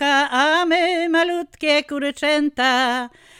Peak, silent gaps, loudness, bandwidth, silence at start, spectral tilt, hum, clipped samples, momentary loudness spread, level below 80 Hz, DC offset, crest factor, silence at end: -6 dBFS; none; -18 LUFS; 14.5 kHz; 0 s; -1.5 dB/octave; none; under 0.1%; 6 LU; -60 dBFS; under 0.1%; 14 dB; 0.3 s